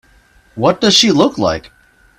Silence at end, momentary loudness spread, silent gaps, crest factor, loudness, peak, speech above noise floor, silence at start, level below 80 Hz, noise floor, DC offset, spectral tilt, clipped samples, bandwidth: 0.6 s; 9 LU; none; 16 dB; -12 LUFS; 0 dBFS; 37 dB; 0.55 s; -46 dBFS; -49 dBFS; under 0.1%; -3.5 dB/octave; under 0.1%; 15.5 kHz